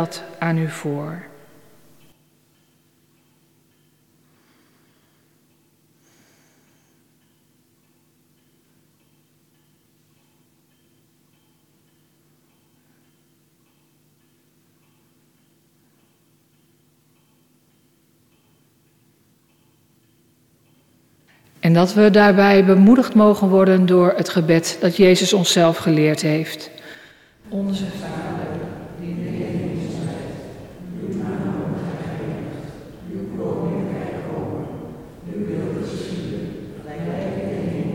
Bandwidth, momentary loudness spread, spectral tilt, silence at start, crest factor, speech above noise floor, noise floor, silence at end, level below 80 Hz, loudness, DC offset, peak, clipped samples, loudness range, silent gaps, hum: 16 kHz; 21 LU; -6 dB/octave; 0 s; 18 dB; 45 dB; -60 dBFS; 0 s; -54 dBFS; -19 LUFS; under 0.1%; -4 dBFS; under 0.1%; 15 LU; none; none